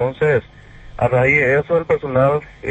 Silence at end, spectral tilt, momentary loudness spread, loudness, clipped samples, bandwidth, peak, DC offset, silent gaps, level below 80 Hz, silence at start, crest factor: 0 s; -8 dB/octave; 8 LU; -17 LUFS; under 0.1%; 8.4 kHz; -2 dBFS; under 0.1%; none; -42 dBFS; 0 s; 16 dB